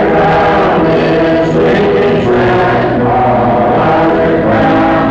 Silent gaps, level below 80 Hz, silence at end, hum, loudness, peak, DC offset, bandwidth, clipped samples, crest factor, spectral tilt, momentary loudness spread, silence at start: none; -30 dBFS; 0 s; none; -9 LUFS; -4 dBFS; under 0.1%; 7.8 kHz; under 0.1%; 6 dB; -8 dB/octave; 1 LU; 0 s